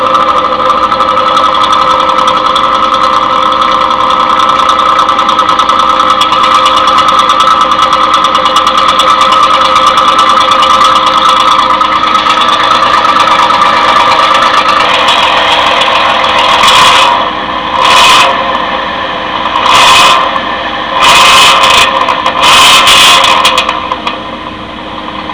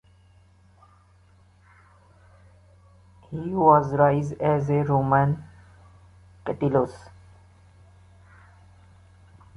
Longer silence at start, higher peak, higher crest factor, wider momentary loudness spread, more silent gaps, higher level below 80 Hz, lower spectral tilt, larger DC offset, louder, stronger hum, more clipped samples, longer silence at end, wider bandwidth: second, 0 s vs 3.3 s; first, 0 dBFS vs -4 dBFS; second, 6 dB vs 22 dB; second, 10 LU vs 16 LU; neither; first, -36 dBFS vs -54 dBFS; second, -1 dB/octave vs -9.5 dB/octave; first, 0.7% vs under 0.1%; first, -5 LUFS vs -23 LUFS; neither; first, 5% vs under 0.1%; second, 0 s vs 2.6 s; first, 11 kHz vs 7.8 kHz